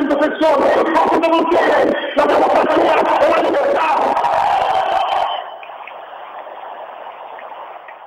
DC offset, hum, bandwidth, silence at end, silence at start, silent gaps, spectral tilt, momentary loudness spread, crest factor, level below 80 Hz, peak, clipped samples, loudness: under 0.1%; 50 Hz at -65 dBFS; 15 kHz; 0 s; 0 s; none; -4.5 dB/octave; 19 LU; 12 dB; -52 dBFS; -4 dBFS; under 0.1%; -14 LUFS